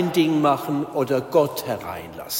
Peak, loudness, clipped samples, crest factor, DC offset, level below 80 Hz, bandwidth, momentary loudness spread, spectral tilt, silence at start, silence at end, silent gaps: -6 dBFS; -22 LUFS; under 0.1%; 16 dB; under 0.1%; -58 dBFS; 16.5 kHz; 11 LU; -5.5 dB/octave; 0 s; 0 s; none